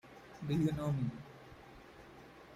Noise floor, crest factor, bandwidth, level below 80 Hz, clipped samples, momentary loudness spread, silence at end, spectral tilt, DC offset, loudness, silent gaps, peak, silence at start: -56 dBFS; 18 dB; 15 kHz; -62 dBFS; under 0.1%; 21 LU; 0 s; -8 dB/octave; under 0.1%; -37 LUFS; none; -22 dBFS; 0.05 s